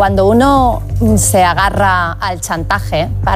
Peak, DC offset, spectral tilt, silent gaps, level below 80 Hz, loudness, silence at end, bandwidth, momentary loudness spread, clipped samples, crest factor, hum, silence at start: -2 dBFS; under 0.1%; -5 dB/octave; none; -24 dBFS; -12 LUFS; 0 s; 16 kHz; 8 LU; under 0.1%; 10 dB; none; 0 s